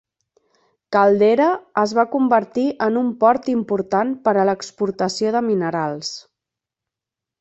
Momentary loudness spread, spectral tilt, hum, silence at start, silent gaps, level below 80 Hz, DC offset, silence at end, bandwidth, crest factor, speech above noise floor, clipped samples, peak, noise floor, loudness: 8 LU; -5.5 dB/octave; none; 0.9 s; none; -64 dBFS; under 0.1%; 1.2 s; 8.2 kHz; 18 dB; 68 dB; under 0.1%; -2 dBFS; -87 dBFS; -19 LUFS